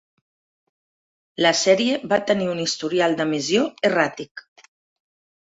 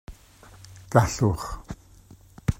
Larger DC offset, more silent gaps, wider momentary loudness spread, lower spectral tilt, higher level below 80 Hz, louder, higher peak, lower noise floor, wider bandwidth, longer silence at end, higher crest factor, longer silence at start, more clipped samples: neither; first, 4.31-4.35 s vs none; second, 6 LU vs 24 LU; second, -3.5 dB/octave vs -6 dB/octave; second, -66 dBFS vs -42 dBFS; first, -20 LUFS vs -25 LUFS; about the same, -2 dBFS vs -2 dBFS; first, under -90 dBFS vs -51 dBFS; second, 8.2 kHz vs 16 kHz; first, 1.1 s vs 0.05 s; second, 20 dB vs 26 dB; first, 1.4 s vs 0.1 s; neither